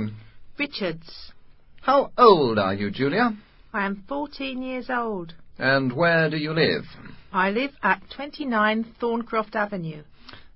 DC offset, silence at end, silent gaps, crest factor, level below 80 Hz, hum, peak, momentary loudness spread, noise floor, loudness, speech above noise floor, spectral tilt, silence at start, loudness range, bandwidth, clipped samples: under 0.1%; 0.1 s; none; 22 dB; -54 dBFS; none; -2 dBFS; 15 LU; -46 dBFS; -23 LUFS; 22 dB; -10 dB/octave; 0 s; 4 LU; 5.8 kHz; under 0.1%